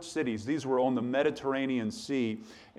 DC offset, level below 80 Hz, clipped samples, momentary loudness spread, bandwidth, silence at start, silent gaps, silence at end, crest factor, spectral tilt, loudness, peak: under 0.1%; -70 dBFS; under 0.1%; 5 LU; 12 kHz; 0 s; none; 0.15 s; 16 dB; -5.5 dB/octave; -31 LUFS; -16 dBFS